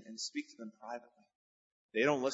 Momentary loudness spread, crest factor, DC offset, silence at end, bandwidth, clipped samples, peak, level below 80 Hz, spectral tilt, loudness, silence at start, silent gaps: 17 LU; 22 dB; under 0.1%; 0 s; 7.6 kHz; under 0.1%; -16 dBFS; -90 dBFS; -3 dB/octave; -38 LUFS; 0 s; 1.35-1.89 s